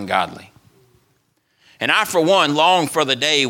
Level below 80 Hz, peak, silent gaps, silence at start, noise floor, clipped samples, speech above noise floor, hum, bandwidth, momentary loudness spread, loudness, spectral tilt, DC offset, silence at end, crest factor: -66 dBFS; 0 dBFS; none; 0 s; -64 dBFS; under 0.1%; 47 dB; none; 17.5 kHz; 8 LU; -16 LUFS; -3 dB/octave; under 0.1%; 0 s; 18 dB